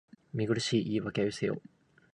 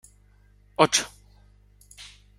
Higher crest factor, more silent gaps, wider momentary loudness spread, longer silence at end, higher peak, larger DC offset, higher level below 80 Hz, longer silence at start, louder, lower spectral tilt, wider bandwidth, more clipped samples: second, 18 dB vs 28 dB; neither; second, 9 LU vs 24 LU; first, 0.55 s vs 0.35 s; second, -16 dBFS vs -2 dBFS; neither; second, -66 dBFS vs -56 dBFS; second, 0.35 s vs 0.8 s; second, -32 LUFS vs -22 LUFS; first, -5.5 dB/octave vs -2.5 dB/octave; second, 11 kHz vs 15.5 kHz; neither